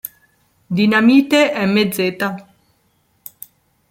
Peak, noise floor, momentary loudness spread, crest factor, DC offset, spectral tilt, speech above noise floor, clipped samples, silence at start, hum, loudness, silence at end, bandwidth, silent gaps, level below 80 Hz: -2 dBFS; -61 dBFS; 22 LU; 16 dB; under 0.1%; -5.5 dB/octave; 47 dB; under 0.1%; 0.05 s; none; -15 LUFS; 1.5 s; 16.5 kHz; none; -60 dBFS